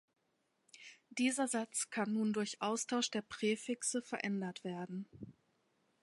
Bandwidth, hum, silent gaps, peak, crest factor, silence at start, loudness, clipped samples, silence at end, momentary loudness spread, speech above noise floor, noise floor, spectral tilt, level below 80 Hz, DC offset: 11.5 kHz; none; none; -22 dBFS; 18 dB; 0.75 s; -38 LUFS; under 0.1%; 0.7 s; 17 LU; 43 dB; -81 dBFS; -3.5 dB/octave; -82 dBFS; under 0.1%